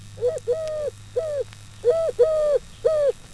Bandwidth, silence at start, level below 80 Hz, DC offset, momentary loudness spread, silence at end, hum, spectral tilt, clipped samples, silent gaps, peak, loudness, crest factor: 11 kHz; 0 s; -48 dBFS; 0.2%; 9 LU; 0 s; none; -4.5 dB/octave; under 0.1%; none; -8 dBFS; -24 LUFS; 16 dB